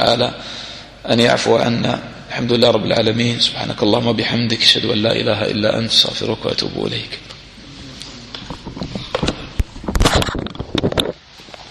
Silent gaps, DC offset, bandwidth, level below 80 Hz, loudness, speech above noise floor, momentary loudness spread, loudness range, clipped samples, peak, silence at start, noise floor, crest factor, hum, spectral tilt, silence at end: none; under 0.1%; 15 kHz; -32 dBFS; -16 LUFS; 22 dB; 18 LU; 9 LU; under 0.1%; 0 dBFS; 0 s; -39 dBFS; 18 dB; none; -4.5 dB/octave; 0 s